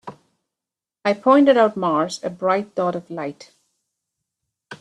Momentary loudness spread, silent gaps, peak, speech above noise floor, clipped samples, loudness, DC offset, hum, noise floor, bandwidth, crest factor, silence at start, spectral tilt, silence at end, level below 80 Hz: 16 LU; none; -2 dBFS; 69 dB; under 0.1%; -19 LUFS; under 0.1%; none; -88 dBFS; 11 kHz; 18 dB; 0.05 s; -5.5 dB/octave; 0.05 s; -70 dBFS